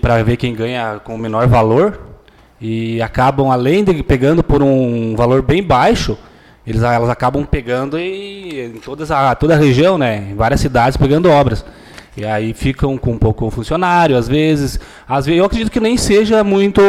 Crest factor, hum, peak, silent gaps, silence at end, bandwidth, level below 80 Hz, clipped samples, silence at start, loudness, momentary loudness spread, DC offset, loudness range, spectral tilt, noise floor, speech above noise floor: 10 dB; none; -4 dBFS; none; 0 s; 14.5 kHz; -28 dBFS; under 0.1%; 0.05 s; -14 LUFS; 12 LU; under 0.1%; 3 LU; -6.5 dB/octave; -42 dBFS; 29 dB